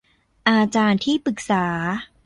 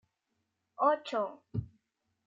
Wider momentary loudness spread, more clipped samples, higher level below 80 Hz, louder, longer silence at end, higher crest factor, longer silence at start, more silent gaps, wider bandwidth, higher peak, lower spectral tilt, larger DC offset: second, 6 LU vs 12 LU; neither; first, -56 dBFS vs -62 dBFS; first, -20 LUFS vs -33 LUFS; second, 0.2 s vs 0.65 s; about the same, 18 dB vs 22 dB; second, 0.45 s vs 0.8 s; neither; first, 11 kHz vs 7.6 kHz; first, -2 dBFS vs -14 dBFS; second, -5 dB/octave vs -7 dB/octave; neither